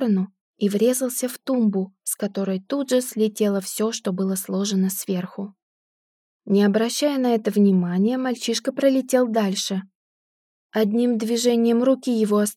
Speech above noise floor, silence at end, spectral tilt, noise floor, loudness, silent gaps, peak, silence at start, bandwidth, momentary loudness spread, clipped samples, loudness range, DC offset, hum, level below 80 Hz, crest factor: over 69 dB; 0.05 s; -5 dB/octave; under -90 dBFS; -22 LUFS; 0.41-0.54 s, 5.62-6.39 s, 9.95-10.69 s; -6 dBFS; 0 s; 17 kHz; 8 LU; under 0.1%; 3 LU; under 0.1%; none; -86 dBFS; 16 dB